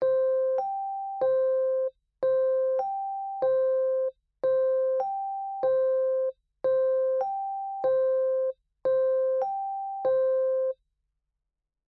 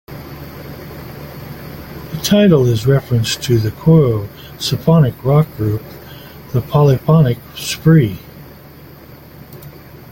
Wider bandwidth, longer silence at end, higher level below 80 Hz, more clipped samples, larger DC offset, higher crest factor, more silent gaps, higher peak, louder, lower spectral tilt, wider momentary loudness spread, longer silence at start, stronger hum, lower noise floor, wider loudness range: second, 4.1 kHz vs 17 kHz; first, 1.15 s vs 0.15 s; second, -72 dBFS vs -42 dBFS; neither; neither; about the same, 10 dB vs 14 dB; neither; second, -16 dBFS vs -2 dBFS; second, -27 LUFS vs -14 LUFS; about the same, -7.5 dB/octave vs -6.5 dB/octave; second, 8 LU vs 21 LU; about the same, 0 s vs 0.1 s; neither; first, -86 dBFS vs -38 dBFS; about the same, 1 LU vs 3 LU